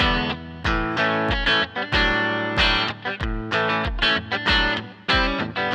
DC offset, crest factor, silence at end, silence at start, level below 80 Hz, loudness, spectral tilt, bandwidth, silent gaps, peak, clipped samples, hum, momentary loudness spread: under 0.1%; 16 dB; 0 s; 0 s; -32 dBFS; -21 LUFS; -5 dB/octave; 9.8 kHz; none; -6 dBFS; under 0.1%; none; 7 LU